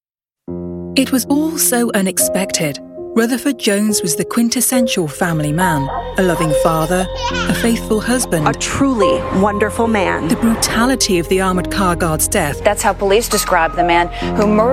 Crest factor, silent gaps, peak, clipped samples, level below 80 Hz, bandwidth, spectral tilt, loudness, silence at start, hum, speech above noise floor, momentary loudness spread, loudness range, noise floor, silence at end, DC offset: 14 dB; none; 0 dBFS; under 0.1%; -32 dBFS; 16.5 kHz; -4 dB/octave; -15 LUFS; 0.5 s; none; 23 dB; 4 LU; 1 LU; -38 dBFS; 0 s; under 0.1%